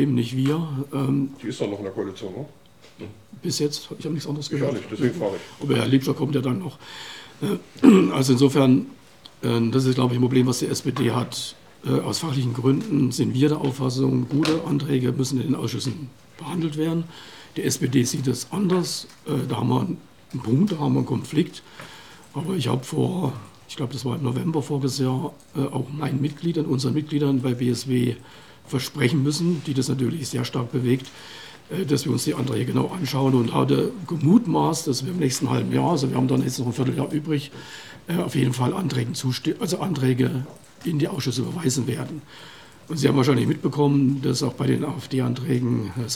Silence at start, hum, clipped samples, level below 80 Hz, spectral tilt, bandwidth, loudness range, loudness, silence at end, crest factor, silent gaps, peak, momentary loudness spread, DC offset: 0 s; none; under 0.1%; -64 dBFS; -6 dB/octave; 16.5 kHz; 6 LU; -23 LUFS; 0 s; 22 dB; none; 0 dBFS; 14 LU; 0.2%